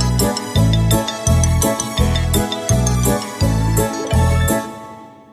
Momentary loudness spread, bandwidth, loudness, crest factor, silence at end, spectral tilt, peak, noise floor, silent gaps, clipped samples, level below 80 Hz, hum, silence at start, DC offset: 4 LU; 14.5 kHz; -17 LUFS; 14 dB; 0.2 s; -5 dB/octave; -2 dBFS; -37 dBFS; none; under 0.1%; -24 dBFS; none; 0 s; under 0.1%